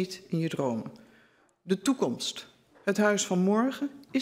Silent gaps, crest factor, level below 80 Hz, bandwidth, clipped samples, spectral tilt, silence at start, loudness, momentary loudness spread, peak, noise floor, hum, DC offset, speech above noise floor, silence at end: none; 18 dB; -74 dBFS; 16 kHz; under 0.1%; -5 dB/octave; 0 s; -29 LUFS; 11 LU; -12 dBFS; -63 dBFS; none; under 0.1%; 35 dB; 0 s